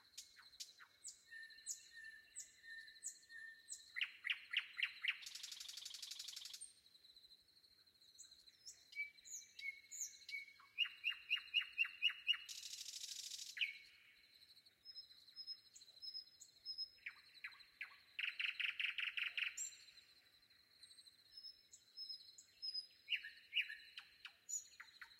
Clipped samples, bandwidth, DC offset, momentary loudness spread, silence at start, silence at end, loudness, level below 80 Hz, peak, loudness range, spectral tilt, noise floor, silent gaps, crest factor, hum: under 0.1%; 16 kHz; under 0.1%; 21 LU; 0.05 s; 0 s; -46 LUFS; under -90 dBFS; -26 dBFS; 12 LU; 4.5 dB/octave; -72 dBFS; none; 24 dB; none